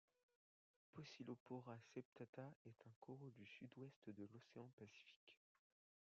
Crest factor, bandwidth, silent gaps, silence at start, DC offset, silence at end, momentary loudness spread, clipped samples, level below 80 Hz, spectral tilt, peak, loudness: 20 dB; 7.2 kHz; 1.40-1.46 s, 2.05-2.16 s, 2.29-2.33 s, 2.56-2.65 s, 2.96-3.02 s, 3.96-4.02 s, 4.73-4.78 s, 5.16-5.27 s; 0.95 s; under 0.1%; 0.75 s; 9 LU; under 0.1%; under -90 dBFS; -6 dB/octave; -42 dBFS; -61 LUFS